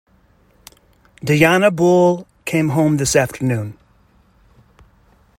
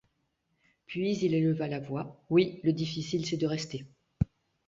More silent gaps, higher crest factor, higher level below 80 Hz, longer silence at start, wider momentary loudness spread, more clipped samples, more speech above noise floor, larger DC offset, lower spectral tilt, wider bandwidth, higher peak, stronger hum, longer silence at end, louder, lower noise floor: neither; about the same, 18 dB vs 20 dB; about the same, -50 dBFS vs -54 dBFS; first, 1.25 s vs 0.9 s; about the same, 12 LU vs 11 LU; neither; second, 40 dB vs 47 dB; neither; about the same, -5.5 dB/octave vs -6.5 dB/octave; first, 16.5 kHz vs 7.8 kHz; first, 0 dBFS vs -12 dBFS; neither; first, 1.65 s vs 0.45 s; first, -16 LUFS vs -31 LUFS; second, -55 dBFS vs -77 dBFS